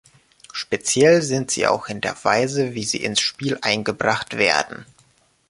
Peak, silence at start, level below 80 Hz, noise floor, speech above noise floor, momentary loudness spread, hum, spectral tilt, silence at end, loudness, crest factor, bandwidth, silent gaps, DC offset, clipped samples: -2 dBFS; 0.55 s; -58 dBFS; -59 dBFS; 38 dB; 11 LU; none; -3 dB/octave; 0.65 s; -20 LUFS; 20 dB; 11.5 kHz; none; under 0.1%; under 0.1%